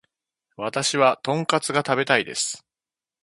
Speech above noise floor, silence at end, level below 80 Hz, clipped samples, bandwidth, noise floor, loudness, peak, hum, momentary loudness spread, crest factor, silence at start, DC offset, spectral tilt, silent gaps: over 68 dB; 0.65 s; -70 dBFS; under 0.1%; 11.5 kHz; under -90 dBFS; -22 LUFS; 0 dBFS; none; 9 LU; 24 dB; 0.6 s; under 0.1%; -3 dB/octave; none